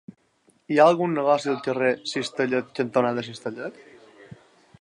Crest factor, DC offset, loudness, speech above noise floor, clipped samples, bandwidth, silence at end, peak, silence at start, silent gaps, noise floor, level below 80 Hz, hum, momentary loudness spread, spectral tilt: 20 dB; under 0.1%; -23 LUFS; 41 dB; under 0.1%; 11 kHz; 0.45 s; -4 dBFS; 0.7 s; none; -64 dBFS; -72 dBFS; none; 15 LU; -5.5 dB/octave